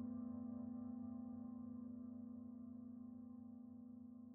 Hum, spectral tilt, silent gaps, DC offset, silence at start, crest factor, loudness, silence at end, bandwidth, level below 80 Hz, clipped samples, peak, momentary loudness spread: none; -11 dB/octave; none; under 0.1%; 0 s; 12 dB; -53 LUFS; 0 s; 1.9 kHz; -82 dBFS; under 0.1%; -40 dBFS; 8 LU